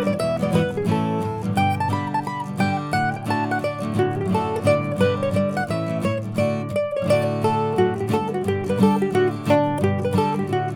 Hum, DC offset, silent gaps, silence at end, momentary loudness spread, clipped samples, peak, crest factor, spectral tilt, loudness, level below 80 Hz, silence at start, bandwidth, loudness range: none; under 0.1%; none; 0 s; 5 LU; under 0.1%; -4 dBFS; 16 dB; -7 dB/octave; -22 LUFS; -54 dBFS; 0 s; 18 kHz; 2 LU